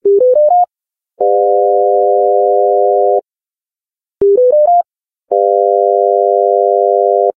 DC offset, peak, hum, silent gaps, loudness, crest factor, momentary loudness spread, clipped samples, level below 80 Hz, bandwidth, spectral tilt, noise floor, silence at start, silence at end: under 0.1%; 0 dBFS; none; none; -11 LUFS; 10 dB; 5 LU; under 0.1%; -58 dBFS; 1.3 kHz; -12 dB/octave; under -90 dBFS; 0.05 s; 0.05 s